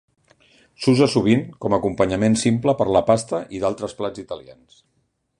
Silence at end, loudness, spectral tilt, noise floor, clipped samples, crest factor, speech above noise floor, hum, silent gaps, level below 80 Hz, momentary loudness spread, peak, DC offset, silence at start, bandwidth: 0.85 s; -20 LUFS; -6 dB/octave; -56 dBFS; under 0.1%; 18 dB; 36 dB; none; none; -50 dBFS; 12 LU; -2 dBFS; under 0.1%; 0.8 s; 11 kHz